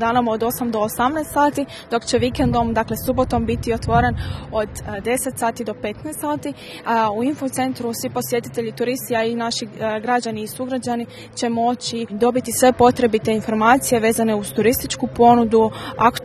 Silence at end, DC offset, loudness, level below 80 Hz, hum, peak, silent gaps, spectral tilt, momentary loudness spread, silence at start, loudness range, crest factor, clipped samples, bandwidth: 0 s; under 0.1%; -20 LUFS; -40 dBFS; none; 0 dBFS; none; -4.5 dB/octave; 11 LU; 0 s; 6 LU; 20 dB; under 0.1%; 13 kHz